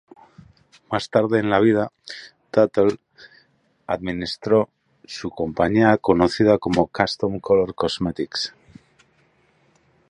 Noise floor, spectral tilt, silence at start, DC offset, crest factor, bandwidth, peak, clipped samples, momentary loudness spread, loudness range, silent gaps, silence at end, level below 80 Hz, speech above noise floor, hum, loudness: -61 dBFS; -6 dB/octave; 0.9 s; under 0.1%; 22 dB; 10.5 kHz; 0 dBFS; under 0.1%; 14 LU; 4 LU; none; 1.6 s; -50 dBFS; 41 dB; none; -21 LUFS